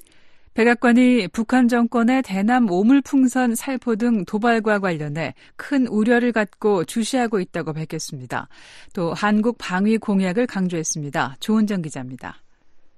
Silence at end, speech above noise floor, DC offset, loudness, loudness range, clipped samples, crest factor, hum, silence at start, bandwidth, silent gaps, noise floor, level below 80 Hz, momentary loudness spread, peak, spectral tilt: 0.1 s; 27 dB; under 0.1%; -20 LUFS; 5 LU; under 0.1%; 16 dB; none; 0.25 s; 13 kHz; none; -47 dBFS; -56 dBFS; 13 LU; -4 dBFS; -5.5 dB/octave